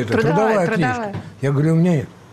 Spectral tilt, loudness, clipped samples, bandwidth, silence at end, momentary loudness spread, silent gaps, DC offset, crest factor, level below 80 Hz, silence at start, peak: -7.5 dB/octave; -18 LUFS; under 0.1%; 12.5 kHz; 0.25 s; 9 LU; none; under 0.1%; 10 dB; -52 dBFS; 0 s; -8 dBFS